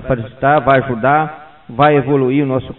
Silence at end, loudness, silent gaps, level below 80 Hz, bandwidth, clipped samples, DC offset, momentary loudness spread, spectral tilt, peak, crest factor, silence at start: 0.05 s; -14 LUFS; none; -42 dBFS; 4.2 kHz; under 0.1%; 0.4%; 8 LU; -10.5 dB/octave; 0 dBFS; 14 dB; 0 s